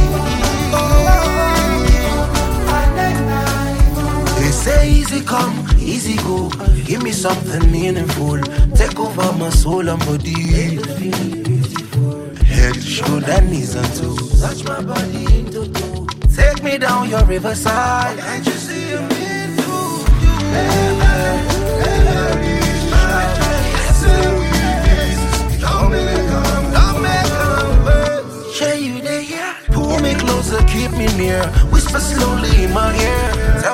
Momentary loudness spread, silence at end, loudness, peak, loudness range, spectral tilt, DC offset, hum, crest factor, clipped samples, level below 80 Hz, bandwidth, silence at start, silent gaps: 6 LU; 0 s; -16 LUFS; 0 dBFS; 3 LU; -5 dB/octave; under 0.1%; none; 14 dB; under 0.1%; -16 dBFS; 16.5 kHz; 0 s; none